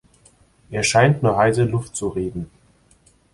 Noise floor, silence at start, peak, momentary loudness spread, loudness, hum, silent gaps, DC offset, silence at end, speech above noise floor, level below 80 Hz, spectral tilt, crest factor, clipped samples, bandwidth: -56 dBFS; 0.7 s; -2 dBFS; 15 LU; -19 LUFS; none; none; under 0.1%; 0.9 s; 37 dB; -46 dBFS; -5 dB/octave; 18 dB; under 0.1%; 11.5 kHz